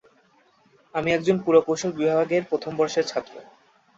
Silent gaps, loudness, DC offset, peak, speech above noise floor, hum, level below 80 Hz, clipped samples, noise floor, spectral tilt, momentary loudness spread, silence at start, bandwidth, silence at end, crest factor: none; -23 LUFS; under 0.1%; -6 dBFS; 38 dB; none; -64 dBFS; under 0.1%; -60 dBFS; -5 dB/octave; 11 LU; 0.95 s; 7.8 kHz; 0.55 s; 20 dB